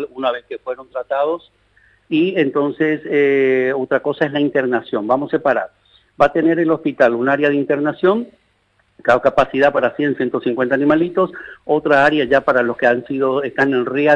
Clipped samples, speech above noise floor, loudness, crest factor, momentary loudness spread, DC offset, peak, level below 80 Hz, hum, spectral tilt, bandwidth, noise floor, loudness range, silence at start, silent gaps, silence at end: under 0.1%; 45 dB; -17 LUFS; 14 dB; 8 LU; under 0.1%; -2 dBFS; -52 dBFS; 50 Hz at -60 dBFS; -7 dB/octave; 8.4 kHz; -61 dBFS; 2 LU; 0 s; none; 0 s